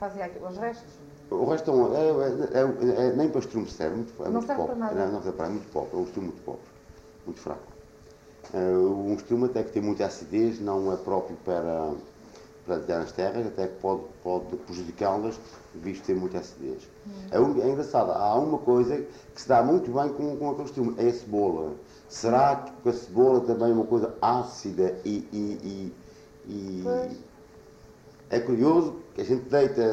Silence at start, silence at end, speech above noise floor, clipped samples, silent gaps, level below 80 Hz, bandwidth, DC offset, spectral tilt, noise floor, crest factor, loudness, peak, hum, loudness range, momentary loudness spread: 0 s; 0 s; 25 dB; under 0.1%; none; -58 dBFS; 8.2 kHz; under 0.1%; -7 dB/octave; -51 dBFS; 18 dB; -27 LUFS; -10 dBFS; none; 7 LU; 15 LU